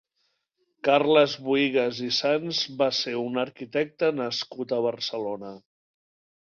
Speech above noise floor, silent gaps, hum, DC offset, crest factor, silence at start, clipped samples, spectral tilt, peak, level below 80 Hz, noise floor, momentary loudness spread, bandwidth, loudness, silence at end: 49 dB; none; none; under 0.1%; 20 dB; 0.85 s; under 0.1%; -4.5 dB/octave; -6 dBFS; -72 dBFS; -75 dBFS; 10 LU; 7.2 kHz; -25 LUFS; 0.9 s